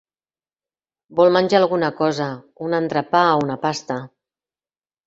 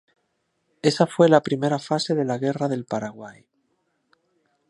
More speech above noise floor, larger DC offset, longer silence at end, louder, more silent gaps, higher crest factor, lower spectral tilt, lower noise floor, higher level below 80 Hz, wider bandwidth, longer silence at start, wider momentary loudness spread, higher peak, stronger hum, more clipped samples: first, over 71 dB vs 51 dB; neither; second, 1 s vs 1.4 s; first, -19 LUFS vs -22 LUFS; neither; about the same, 20 dB vs 22 dB; about the same, -5.5 dB/octave vs -6 dB/octave; first, under -90 dBFS vs -73 dBFS; first, -64 dBFS vs -70 dBFS; second, 8 kHz vs 11.5 kHz; first, 1.1 s vs 0.85 s; about the same, 12 LU vs 14 LU; about the same, -2 dBFS vs -2 dBFS; neither; neither